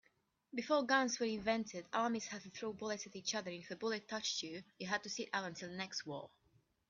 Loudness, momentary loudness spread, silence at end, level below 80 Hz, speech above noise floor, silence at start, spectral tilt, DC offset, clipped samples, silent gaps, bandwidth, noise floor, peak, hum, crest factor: -40 LUFS; 13 LU; 0.65 s; -78 dBFS; 37 dB; 0.55 s; -3 dB/octave; under 0.1%; under 0.1%; none; 7.6 kHz; -77 dBFS; -20 dBFS; none; 22 dB